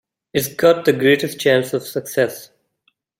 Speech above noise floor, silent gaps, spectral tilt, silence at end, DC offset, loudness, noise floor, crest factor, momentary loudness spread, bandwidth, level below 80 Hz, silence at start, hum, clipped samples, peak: 49 dB; none; -4.5 dB/octave; 0.75 s; under 0.1%; -18 LUFS; -66 dBFS; 18 dB; 9 LU; 16.5 kHz; -60 dBFS; 0.35 s; none; under 0.1%; -2 dBFS